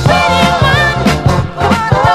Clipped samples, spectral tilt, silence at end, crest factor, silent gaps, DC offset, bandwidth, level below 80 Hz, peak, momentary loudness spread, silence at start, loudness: 0.3%; -5.5 dB/octave; 0 s; 10 dB; none; under 0.1%; 14.5 kHz; -24 dBFS; 0 dBFS; 4 LU; 0 s; -10 LUFS